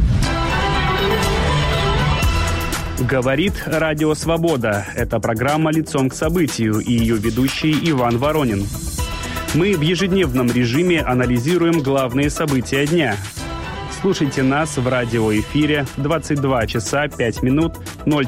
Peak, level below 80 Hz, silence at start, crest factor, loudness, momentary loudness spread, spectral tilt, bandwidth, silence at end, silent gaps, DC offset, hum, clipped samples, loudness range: -6 dBFS; -30 dBFS; 0 s; 12 dB; -18 LUFS; 5 LU; -5.5 dB/octave; 16.5 kHz; 0 s; none; under 0.1%; none; under 0.1%; 2 LU